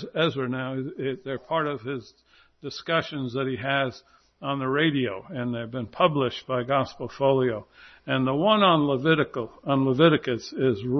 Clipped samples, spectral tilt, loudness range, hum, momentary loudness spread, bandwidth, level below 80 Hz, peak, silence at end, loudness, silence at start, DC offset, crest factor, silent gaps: under 0.1%; -7 dB/octave; 7 LU; none; 13 LU; 6.4 kHz; -62 dBFS; -4 dBFS; 0 s; -25 LUFS; 0 s; under 0.1%; 20 dB; none